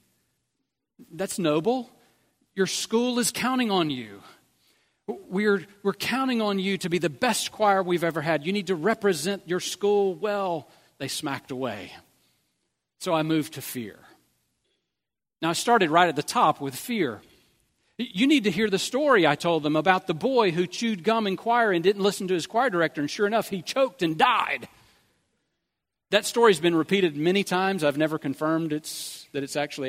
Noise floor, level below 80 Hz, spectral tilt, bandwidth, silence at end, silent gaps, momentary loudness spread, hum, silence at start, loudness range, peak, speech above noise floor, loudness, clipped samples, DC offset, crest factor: -88 dBFS; -70 dBFS; -4.5 dB/octave; 16 kHz; 0 s; none; 12 LU; none; 1 s; 7 LU; -4 dBFS; 63 dB; -25 LUFS; under 0.1%; under 0.1%; 22 dB